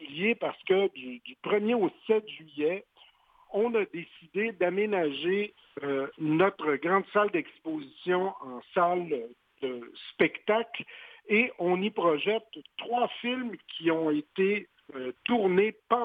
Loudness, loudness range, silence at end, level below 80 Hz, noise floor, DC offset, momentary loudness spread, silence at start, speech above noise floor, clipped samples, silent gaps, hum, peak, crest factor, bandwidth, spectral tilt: -29 LUFS; 2 LU; 0 s; -76 dBFS; -60 dBFS; under 0.1%; 13 LU; 0 s; 31 dB; under 0.1%; none; none; -8 dBFS; 20 dB; 4.8 kHz; -8 dB/octave